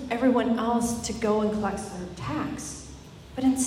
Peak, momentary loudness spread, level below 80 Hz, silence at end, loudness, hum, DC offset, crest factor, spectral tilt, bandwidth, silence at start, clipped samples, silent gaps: -12 dBFS; 16 LU; -50 dBFS; 0 s; -27 LUFS; none; under 0.1%; 16 dB; -5 dB/octave; 15.5 kHz; 0 s; under 0.1%; none